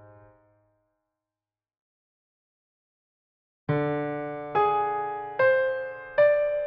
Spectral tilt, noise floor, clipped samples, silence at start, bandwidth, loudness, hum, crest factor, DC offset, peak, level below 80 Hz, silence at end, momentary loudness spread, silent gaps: -5 dB/octave; under -90 dBFS; under 0.1%; 3.7 s; 5.2 kHz; -26 LUFS; none; 18 dB; under 0.1%; -12 dBFS; -64 dBFS; 0 s; 11 LU; none